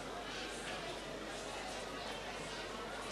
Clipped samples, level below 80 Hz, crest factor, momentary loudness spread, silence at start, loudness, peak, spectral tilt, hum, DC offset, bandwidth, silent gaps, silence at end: under 0.1%; -60 dBFS; 14 dB; 2 LU; 0 s; -44 LUFS; -32 dBFS; -2.5 dB/octave; none; under 0.1%; 13.5 kHz; none; 0 s